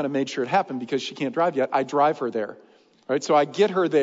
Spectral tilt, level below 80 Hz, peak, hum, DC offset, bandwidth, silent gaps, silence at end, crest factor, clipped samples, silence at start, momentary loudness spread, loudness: -5 dB/octave; -78 dBFS; -8 dBFS; none; under 0.1%; 7.8 kHz; none; 0 s; 16 dB; under 0.1%; 0 s; 8 LU; -23 LUFS